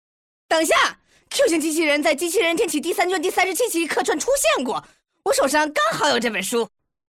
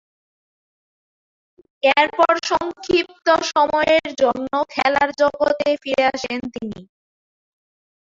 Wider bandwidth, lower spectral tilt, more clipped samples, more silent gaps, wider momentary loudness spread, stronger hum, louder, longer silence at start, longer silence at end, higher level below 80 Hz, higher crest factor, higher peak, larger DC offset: first, 17.5 kHz vs 7.8 kHz; second, -1.5 dB/octave vs -3 dB/octave; neither; neither; second, 6 LU vs 10 LU; neither; about the same, -20 LUFS vs -18 LUFS; second, 0.5 s vs 1.85 s; second, 0.45 s vs 1.35 s; about the same, -56 dBFS vs -56 dBFS; second, 14 dB vs 20 dB; second, -8 dBFS vs -2 dBFS; neither